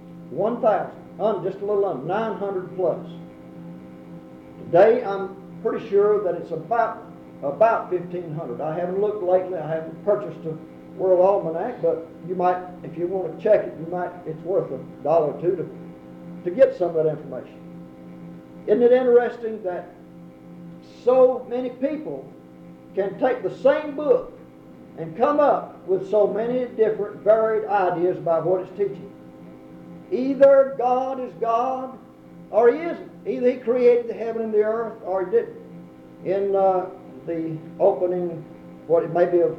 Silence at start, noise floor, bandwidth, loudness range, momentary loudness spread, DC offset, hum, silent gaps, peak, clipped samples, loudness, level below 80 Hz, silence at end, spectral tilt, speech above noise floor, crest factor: 0 s; -44 dBFS; 6.2 kHz; 4 LU; 23 LU; under 0.1%; none; none; -4 dBFS; under 0.1%; -22 LUFS; -64 dBFS; 0 s; -8.5 dB/octave; 23 dB; 18 dB